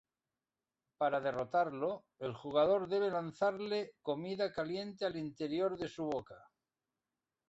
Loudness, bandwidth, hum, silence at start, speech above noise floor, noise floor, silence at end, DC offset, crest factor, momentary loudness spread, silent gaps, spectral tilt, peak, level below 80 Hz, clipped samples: -37 LUFS; 8 kHz; none; 1 s; over 54 dB; under -90 dBFS; 1.1 s; under 0.1%; 18 dB; 8 LU; none; -4 dB/octave; -18 dBFS; -74 dBFS; under 0.1%